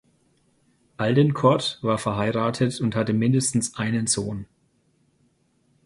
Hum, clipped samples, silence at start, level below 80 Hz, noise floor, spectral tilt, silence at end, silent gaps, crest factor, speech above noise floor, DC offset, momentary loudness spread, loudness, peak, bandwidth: none; under 0.1%; 1 s; -56 dBFS; -65 dBFS; -5 dB/octave; 1.4 s; none; 20 dB; 43 dB; under 0.1%; 5 LU; -23 LUFS; -4 dBFS; 11.5 kHz